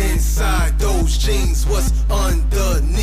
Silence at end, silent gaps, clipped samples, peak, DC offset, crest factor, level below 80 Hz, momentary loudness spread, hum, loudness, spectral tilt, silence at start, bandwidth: 0 s; none; under 0.1%; -6 dBFS; under 0.1%; 10 dB; -16 dBFS; 1 LU; none; -18 LUFS; -4.5 dB/octave; 0 s; 15.5 kHz